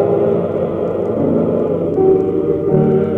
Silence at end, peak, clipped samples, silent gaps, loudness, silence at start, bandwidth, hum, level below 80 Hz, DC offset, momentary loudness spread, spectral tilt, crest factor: 0 s; -2 dBFS; under 0.1%; none; -15 LUFS; 0 s; 3.8 kHz; none; -44 dBFS; under 0.1%; 5 LU; -11 dB/octave; 12 dB